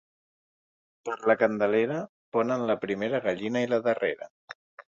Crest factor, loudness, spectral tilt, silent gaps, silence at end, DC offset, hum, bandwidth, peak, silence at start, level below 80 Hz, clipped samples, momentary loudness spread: 22 dB; -27 LUFS; -6.5 dB/octave; 2.09-2.32 s, 4.30-4.48 s, 4.55-4.78 s; 0.05 s; under 0.1%; none; 7.6 kHz; -8 dBFS; 1.05 s; -70 dBFS; under 0.1%; 16 LU